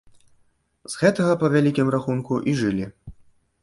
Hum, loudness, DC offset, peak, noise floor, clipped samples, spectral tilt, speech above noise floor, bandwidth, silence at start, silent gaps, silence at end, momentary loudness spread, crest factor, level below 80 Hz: none; -21 LUFS; under 0.1%; -4 dBFS; -63 dBFS; under 0.1%; -6.5 dB/octave; 42 dB; 11.5 kHz; 0.9 s; none; 0.5 s; 10 LU; 18 dB; -54 dBFS